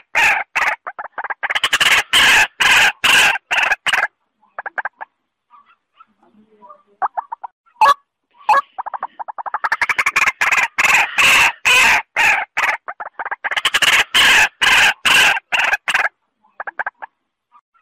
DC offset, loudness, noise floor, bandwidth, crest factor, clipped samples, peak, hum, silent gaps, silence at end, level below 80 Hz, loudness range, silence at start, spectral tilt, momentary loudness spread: under 0.1%; -13 LUFS; -61 dBFS; 16 kHz; 14 dB; under 0.1%; -2 dBFS; none; 7.52-7.64 s; 0.75 s; -50 dBFS; 10 LU; 0.15 s; 1 dB/octave; 18 LU